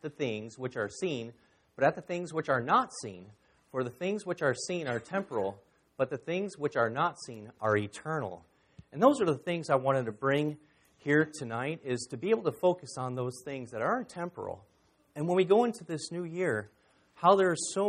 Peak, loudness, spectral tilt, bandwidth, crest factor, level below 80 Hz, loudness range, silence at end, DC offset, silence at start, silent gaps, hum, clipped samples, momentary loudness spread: -8 dBFS; -31 LUFS; -5.5 dB/octave; 13.5 kHz; 22 dB; -72 dBFS; 4 LU; 0 s; under 0.1%; 0.05 s; none; none; under 0.1%; 14 LU